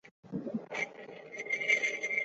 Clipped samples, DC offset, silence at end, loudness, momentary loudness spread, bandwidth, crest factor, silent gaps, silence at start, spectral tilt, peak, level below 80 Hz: under 0.1%; under 0.1%; 0 s; -33 LUFS; 16 LU; 8 kHz; 22 dB; 0.11-0.23 s; 0.05 s; -2 dB/octave; -14 dBFS; -78 dBFS